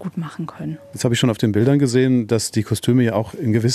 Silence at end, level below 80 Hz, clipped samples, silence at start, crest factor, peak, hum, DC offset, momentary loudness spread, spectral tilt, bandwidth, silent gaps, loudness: 0 s; -54 dBFS; under 0.1%; 0 s; 16 dB; -4 dBFS; none; under 0.1%; 13 LU; -6 dB/octave; 14 kHz; none; -19 LUFS